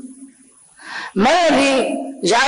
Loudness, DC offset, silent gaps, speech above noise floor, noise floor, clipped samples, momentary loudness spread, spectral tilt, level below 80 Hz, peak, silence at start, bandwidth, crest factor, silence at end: -16 LUFS; under 0.1%; none; 34 dB; -49 dBFS; under 0.1%; 17 LU; -3.5 dB/octave; -52 dBFS; -8 dBFS; 0.05 s; 11 kHz; 10 dB; 0 s